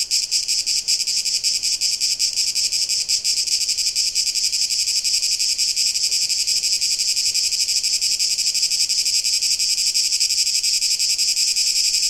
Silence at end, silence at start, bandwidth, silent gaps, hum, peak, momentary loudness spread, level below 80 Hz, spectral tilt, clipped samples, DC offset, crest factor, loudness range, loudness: 0 s; 0 s; 16.5 kHz; none; none; -4 dBFS; 2 LU; -58 dBFS; 4.5 dB/octave; under 0.1%; 0.2%; 16 dB; 1 LU; -17 LUFS